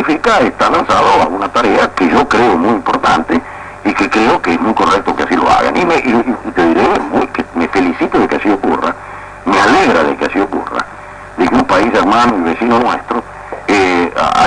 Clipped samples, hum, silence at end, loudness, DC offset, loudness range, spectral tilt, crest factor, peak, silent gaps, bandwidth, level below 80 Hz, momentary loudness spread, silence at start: under 0.1%; none; 0 s; -12 LUFS; under 0.1%; 2 LU; -5 dB/octave; 10 dB; 0 dBFS; none; 10.5 kHz; -38 dBFS; 9 LU; 0 s